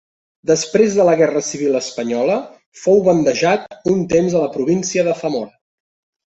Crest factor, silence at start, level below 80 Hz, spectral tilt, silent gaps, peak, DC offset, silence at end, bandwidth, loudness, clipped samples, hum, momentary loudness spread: 16 dB; 0.45 s; -56 dBFS; -5 dB/octave; 2.66-2.72 s; -2 dBFS; under 0.1%; 0.8 s; 8.2 kHz; -17 LUFS; under 0.1%; none; 10 LU